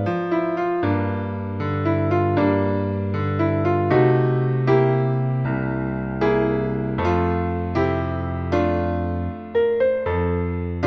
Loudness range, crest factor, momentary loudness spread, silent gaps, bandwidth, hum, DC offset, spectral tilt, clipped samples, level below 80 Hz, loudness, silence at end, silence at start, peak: 3 LU; 16 dB; 7 LU; none; 6.2 kHz; none; under 0.1%; -9.5 dB/octave; under 0.1%; -40 dBFS; -21 LUFS; 0 s; 0 s; -4 dBFS